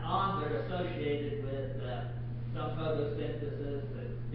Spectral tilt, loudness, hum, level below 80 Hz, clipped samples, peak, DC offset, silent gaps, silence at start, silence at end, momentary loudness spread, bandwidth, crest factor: -6 dB/octave; -36 LUFS; none; -48 dBFS; under 0.1%; -18 dBFS; under 0.1%; none; 0 s; 0 s; 7 LU; 5 kHz; 18 dB